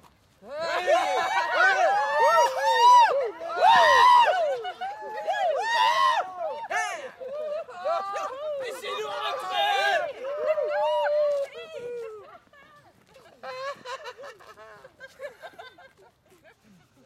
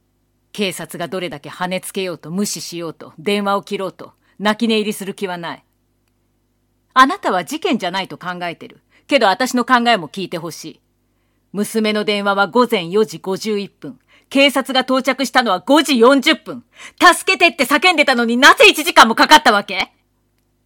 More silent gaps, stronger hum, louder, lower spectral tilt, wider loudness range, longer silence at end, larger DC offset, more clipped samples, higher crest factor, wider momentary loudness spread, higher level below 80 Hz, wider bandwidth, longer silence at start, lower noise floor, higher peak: neither; second, none vs 50 Hz at -65 dBFS; second, -23 LUFS vs -15 LUFS; second, -0.5 dB/octave vs -3 dB/octave; first, 21 LU vs 11 LU; first, 1.35 s vs 0.8 s; neither; second, under 0.1% vs 0.3%; about the same, 16 dB vs 16 dB; first, 21 LU vs 18 LU; second, -72 dBFS vs -56 dBFS; second, 15 kHz vs 17.5 kHz; about the same, 0.45 s vs 0.55 s; second, -58 dBFS vs -63 dBFS; second, -8 dBFS vs 0 dBFS